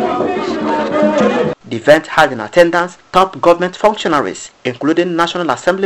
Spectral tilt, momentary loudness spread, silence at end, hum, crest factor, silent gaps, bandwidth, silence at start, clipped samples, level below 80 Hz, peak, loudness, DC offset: -5 dB/octave; 6 LU; 0 s; none; 14 dB; none; 15 kHz; 0 s; 0.3%; -48 dBFS; 0 dBFS; -14 LUFS; under 0.1%